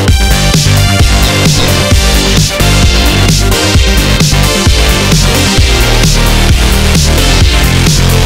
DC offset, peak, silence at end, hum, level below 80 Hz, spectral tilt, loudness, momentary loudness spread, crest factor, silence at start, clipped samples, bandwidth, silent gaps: under 0.1%; 0 dBFS; 0 s; none; -10 dBFS; -4 dB/octave; -7 LUFS; 1 LU; 6 dB; 0 s; 0.5%; 16.5 kHz; none